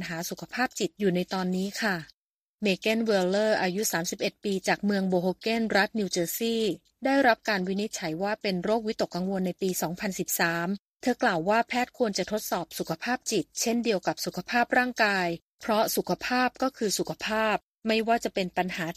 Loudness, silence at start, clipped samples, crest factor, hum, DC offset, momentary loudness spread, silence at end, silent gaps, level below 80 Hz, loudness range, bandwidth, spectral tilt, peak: -28 LUFS; 0 s; under 0.1%; 20 dB; none; under 0.1%; 7 LU; 0.05 s; 2.14-2.58 s, 10.80-10.94 s, 15.42-15.58 s, 17.63-17.75 s; -64 dBFS; 2 LU; 15.5 kHz; -4 dB/octave; -8 dBFS